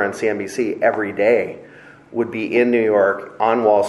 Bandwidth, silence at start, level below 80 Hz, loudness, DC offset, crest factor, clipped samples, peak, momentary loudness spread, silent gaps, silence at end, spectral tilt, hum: 12 kHz; 0 s; -66 dBFS; -18 LUFS; under 0.1%; 16 dB; under 0.1%; -2 dBFS; 9 LU; none; 0 s; -5.5 dB/octave; none